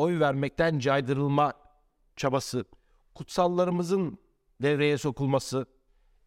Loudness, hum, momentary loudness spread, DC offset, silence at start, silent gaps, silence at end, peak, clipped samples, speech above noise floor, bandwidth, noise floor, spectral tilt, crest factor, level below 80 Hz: -28 LUFS; none; 9 LU; under 0.1%; 0 s; none; 0.6 s; -12 dBFS; under 0.1%; 39 dB; 15.5 kHz; -66 dBFS; -6 dB/octave; 16 dB; -58 dBFS